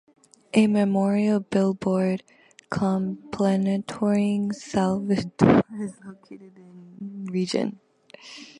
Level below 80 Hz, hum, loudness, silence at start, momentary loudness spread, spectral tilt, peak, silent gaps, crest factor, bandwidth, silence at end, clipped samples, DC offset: -58 dBFS; none; -24 LUFS; 0.55 s; 15 LU; -7 dB/octave; -2 dBFS; none; 24 dB; 10.5 kHz; 0.15 s; under 0.1%; under 0.1%